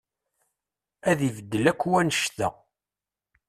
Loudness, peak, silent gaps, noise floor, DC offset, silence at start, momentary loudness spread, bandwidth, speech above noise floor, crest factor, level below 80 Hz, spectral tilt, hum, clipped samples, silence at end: -25 LUFS; -6 dBFS; none; under -90 dBFS; under 0.1%; 1.05 s; 8 LU; 14.5 kHz; over 66 dB; 22 dB; -60 dBFS; -4.5 dB/octave; none; under 0.1%; 1 s